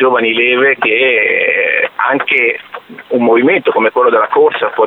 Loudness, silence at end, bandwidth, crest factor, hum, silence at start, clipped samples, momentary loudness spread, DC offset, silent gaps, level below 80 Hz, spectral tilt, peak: -11 LUFS; 0 s; 4.2 kHz; 10 dB; none; 0 s; under 0.1%; 5 LU; under 0.1%; none; -66 dBFS; -6.5 dB/octave; 0 dBFS